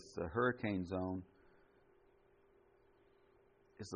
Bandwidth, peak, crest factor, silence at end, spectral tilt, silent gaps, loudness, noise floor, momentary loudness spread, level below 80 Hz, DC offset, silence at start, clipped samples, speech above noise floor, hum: 7.2 kHz; -22 dBFS; 22 dB; 0 s; -6 dB/octave; none; -40 LUFS; -70 dBFS; 11 LU; -72 dBFS; under 0.1%; 0 s; under 0.1%; 31 dB; 60 Hz at -75 dBFS